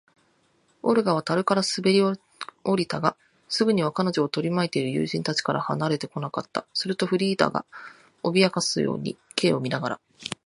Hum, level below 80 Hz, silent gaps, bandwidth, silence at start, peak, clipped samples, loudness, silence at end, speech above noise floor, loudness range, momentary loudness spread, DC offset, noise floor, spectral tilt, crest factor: none; -66 dBFS; none; 11.5 kHz; 0.85 s; -2 dBFS; under 0.1%; -25 LUFS; 0.1 s; 41 dB; 2 LU; 10 LU; under 0.1%; -65 dBFS; -5 dB/octave; 24 dB